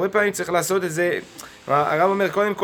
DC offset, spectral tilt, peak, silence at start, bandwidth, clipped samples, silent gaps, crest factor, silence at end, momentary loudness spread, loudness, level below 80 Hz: under 0.1%; -4.5 dB/octave; -4 dBFS; 0 s; 19 kHz; under 0.1%; none; 16 dB; 0 s; 9 LU; -21 LUFS; -62 dBFS